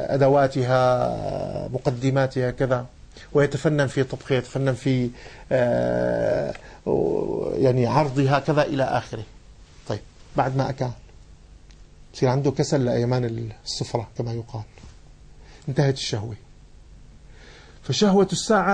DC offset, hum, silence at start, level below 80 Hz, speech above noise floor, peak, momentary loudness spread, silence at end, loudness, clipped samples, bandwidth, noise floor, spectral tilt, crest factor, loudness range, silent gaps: under 0.1%; none; 0 s; -46 dBFS; 25 dB; -6 dBFS; 14 LU; 0 s; -23 LUFS; under 0.1%; 9.8 kHz; -47 dBFS; -6 dB/octave; 18 dB; 7 LU; none